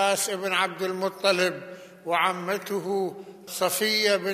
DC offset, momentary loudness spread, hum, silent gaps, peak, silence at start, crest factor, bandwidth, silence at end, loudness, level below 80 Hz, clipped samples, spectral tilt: under 0.1%; 14 LU; none; none; -6 dBFS; 0 s; 20 dB; 15 kHz; 0 s; -25 LUFS; -80 dBFS; under 0.1%; -2.5 dB/octave